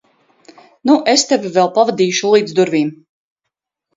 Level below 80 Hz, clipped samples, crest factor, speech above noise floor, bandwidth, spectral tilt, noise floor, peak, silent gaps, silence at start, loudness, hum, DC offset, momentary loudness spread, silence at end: -64 dBFS; under 0.1%; 16 dB; 65 dB; 8.4 kHz; -3.5 dB/octave; -79 dBFS; 0 dBFS; none; 0.85 s; -14 LUFS; none; under 0.1%; 6 LU; 1 s